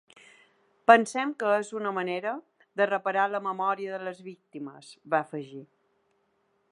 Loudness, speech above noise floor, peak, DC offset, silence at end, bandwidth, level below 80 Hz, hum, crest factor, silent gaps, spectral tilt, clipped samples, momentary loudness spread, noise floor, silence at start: -27 LUFS; 44 dB; -2 dBFS; under 0.1%; 1.1 s; 11.5 kHz; -86 dBFS; none; 26 dB; none; -4.5 dB/octave; under 0.1%; 21 LU; -72 dBFS; 0.9 s